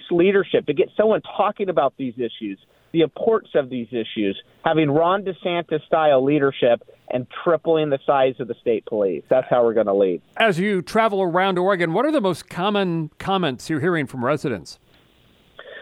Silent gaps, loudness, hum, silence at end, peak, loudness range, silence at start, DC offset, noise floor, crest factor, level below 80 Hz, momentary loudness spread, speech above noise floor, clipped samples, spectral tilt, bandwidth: none; -21 LUFS; none; 0 s; -2 dBFS; 4 LU; 0 s; under 0.1%; -56 dBFS; 18 dB; -60 dBFS; 9 LU; 36 dB; under 0.1%; -6.5 dB/octave; 13 kHz